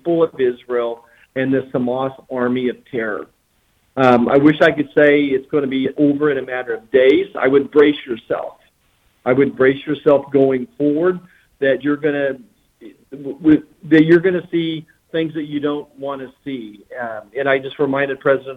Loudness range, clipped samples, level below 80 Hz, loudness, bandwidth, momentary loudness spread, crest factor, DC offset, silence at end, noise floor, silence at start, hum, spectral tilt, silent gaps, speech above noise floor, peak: 7 LU; under 0.1%; -56 dBFS; -17 LUFS; 6 kHz; 16 LU; 16 dB; under 0.1%; 0 s; -61 dBFS; 0.05 s; none; -8 dB/octave; none; 45 dB; -2 dBFS